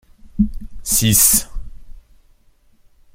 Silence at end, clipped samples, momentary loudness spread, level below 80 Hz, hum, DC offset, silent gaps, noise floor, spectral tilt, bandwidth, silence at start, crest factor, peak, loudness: 1.15 s; under 0.1%; 21 LU; -32 dBFS; none; under 0.1%; none; -53 dBFS; -2.5 dB/octave; 16.5 kHz; 0.25 s; 20 dB; 0 dBFS; -14 LUFS